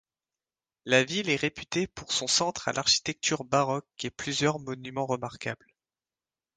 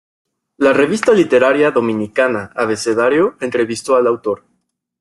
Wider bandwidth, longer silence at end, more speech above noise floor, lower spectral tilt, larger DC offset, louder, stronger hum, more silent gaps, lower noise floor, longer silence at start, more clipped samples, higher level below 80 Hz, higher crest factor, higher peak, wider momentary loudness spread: second, 10 kHz vs 12 kHz; first, 1 s vs 0.65 s; first, over 61 dB vs 53 dB; second, -3 dB/octave vs -5 dB/octave; neither; second, -28 LUFS vs -15 LUFS; neither; neither; first, under -90 dBFS vs -67 dBFS; first, 0.85 s vs 0.6 s; neither; about the same, -62 dBFS vs -58 dBFS; first, 24 dB vs 14 dB; second, -6 dBFS vs 0 dBFS; first, 12 LU vs 8 LU